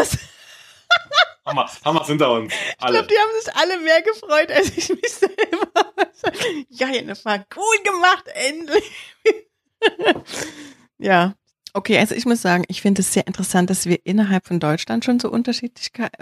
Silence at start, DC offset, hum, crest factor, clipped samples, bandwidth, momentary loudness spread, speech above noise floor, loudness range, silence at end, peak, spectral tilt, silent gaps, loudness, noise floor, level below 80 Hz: 0 s; under 0.1%; none; 18 dB; under 0.1%; 15.5 kHz; 8 LU; 27 dB; 3 LU; 0.15 s; 0 dBFS; -4 dB/octave; none; -19 LUFS; -46 dBFS; -52 dBFS